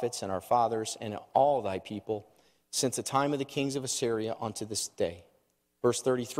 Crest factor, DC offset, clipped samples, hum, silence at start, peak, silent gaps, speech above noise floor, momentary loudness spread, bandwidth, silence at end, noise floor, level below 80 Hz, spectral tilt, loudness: 20 dB; under 0.1%; under 0.1%; none; 0 s; -12 dBFS; none; 42 dB; 9 LU; 16 kHz; 0 s; -72 dBFS; -70 dBFS; -4 dB/octave; -31 LUFS